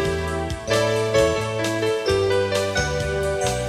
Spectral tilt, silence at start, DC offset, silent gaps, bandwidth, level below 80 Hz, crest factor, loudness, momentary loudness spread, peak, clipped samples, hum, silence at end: -4.5 dB/octave; 0 s; under 0.1%; none; 16 kHz; -38 dBFS; 14 dB; -22 LUFS; 4 LU; -6 dBFS; under 0.1%; none; 0 s